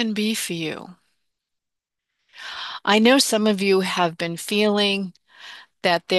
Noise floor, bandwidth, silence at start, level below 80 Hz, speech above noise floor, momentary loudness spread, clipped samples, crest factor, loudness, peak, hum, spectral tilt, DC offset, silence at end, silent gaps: -85 dBFS; 12.5 kHz; 0 s; -70 dBFS; 64 dB; 20 LU; under 0.1%; 18 dB; -20 LUFS; -4 dBFS; none; -3.5 dB/octave; under 0.1%; 0 s; none